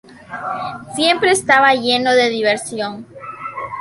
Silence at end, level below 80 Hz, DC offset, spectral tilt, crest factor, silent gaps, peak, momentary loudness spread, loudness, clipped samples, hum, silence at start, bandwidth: 0 s; -58 dBFS; under 0.1%; -2.5 dB/octave; 16 dB; none; -2 dBFS; 18 LU; -16 LUFS; under 0.1%; none; 0.1 s; 11.5 kHz